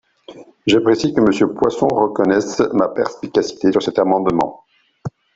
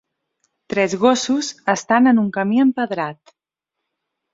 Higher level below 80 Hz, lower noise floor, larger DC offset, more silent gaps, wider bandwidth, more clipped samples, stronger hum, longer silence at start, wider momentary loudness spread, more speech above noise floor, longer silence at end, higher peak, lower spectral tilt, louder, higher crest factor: first, -52 dBFS vs -64 dBFS; second, -40 dBFS vs -82 dBFS; neither; neither; about the same, 8 kHz vs 7.8 kHz; neither; neither; second, 0.3 s vs 0.7 s; about the same, 9 LU vs 10 LU; second, 25 dB vs 64 dB; second, 0.25 s vs 1.2 s; about the same, -2 dBFS vs -2 dBFS; about the same, -5.5 dB/octave vs -4.5 dB/octave; about the same, -17 LUFS vs -18 LUFS; about the same, 14 dB vs 18 dB